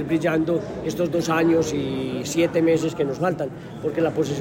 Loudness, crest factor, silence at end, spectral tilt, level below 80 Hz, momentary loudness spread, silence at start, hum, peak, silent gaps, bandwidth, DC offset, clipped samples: -23 LUFS; 14 dB; 0 s; -6 dB/octave; -52 dBFS; 8 LU; 0 s; none; -8 dBFS; none; 16.5 kHz; under 0.1%; under 0.1%